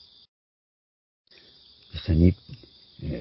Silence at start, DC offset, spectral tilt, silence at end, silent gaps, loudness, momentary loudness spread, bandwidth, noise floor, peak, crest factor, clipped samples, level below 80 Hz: 1.95 s; under 0.1%; -12 dB/octave; 0 s; none; -24 LUFS; 25 LU; 5.8 kHz; -55 dBFS; -6 dBFS; 24 dB; under 0.1%; -36 dBFS